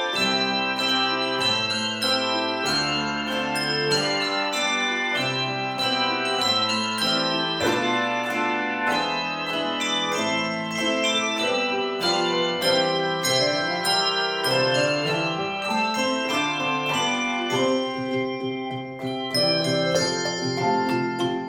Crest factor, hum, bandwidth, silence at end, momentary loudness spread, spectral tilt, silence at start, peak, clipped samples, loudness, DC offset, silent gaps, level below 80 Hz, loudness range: 16 dB; none; 18 kHz; 0 s; 5 LU; -3 dB/octave; 0 s; -8 dBFS; under 0.1%; -23 LUFS; under 0.1%; none; -62 dBFS; 2 LU